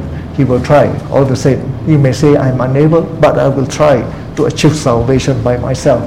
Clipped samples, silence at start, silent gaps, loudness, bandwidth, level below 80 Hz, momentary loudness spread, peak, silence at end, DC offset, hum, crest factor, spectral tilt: 0.4%; 0 s; none; -11 LUFS; 12.5 kHz; -30 dBFS; 5 LU; 0 dBFS; 0 s; 0.8%; none; 10 dB; -7 dB/octave